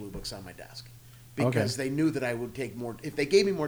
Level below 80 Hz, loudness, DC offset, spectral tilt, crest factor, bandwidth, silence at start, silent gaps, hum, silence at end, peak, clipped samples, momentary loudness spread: -56 dBFS; -29 LUFS; under 0.1%; -5.5 dB/octave; 20 dB; over 20 kHz; 0 s; none; none; 0 s; -10 dBFS; under 0.1%; 19 LU